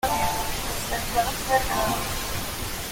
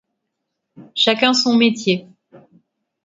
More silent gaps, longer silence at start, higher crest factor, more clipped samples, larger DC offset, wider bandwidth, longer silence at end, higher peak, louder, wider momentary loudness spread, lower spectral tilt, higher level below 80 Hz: neither; second, 0.05 s vs 0.8 s; about the same, 16 dB vs 20 dB; neither; neither; first, 17 kHz vs 7.8 kHz; second, 0 s vs 0.65 s; second, -10 dBFS vs 0 dBFS; second, -26 LUFS vs -16 LUFS; second, 6 LU vs 9 LU; about the same, -3 dB/octave vs -3.5 dB/octave; first, -36 dBFS vs -68 dBFS